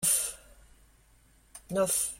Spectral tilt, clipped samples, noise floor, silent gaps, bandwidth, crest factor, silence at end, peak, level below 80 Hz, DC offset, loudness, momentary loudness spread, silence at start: -2 dB/octave; under 0.1%; -62 dBFS; none; 16.5 kHz; 20 dB; 0 s; -14 dBFS; -60 dBFS; under 0.1%; -29 LUFS; 25 LU; 0 s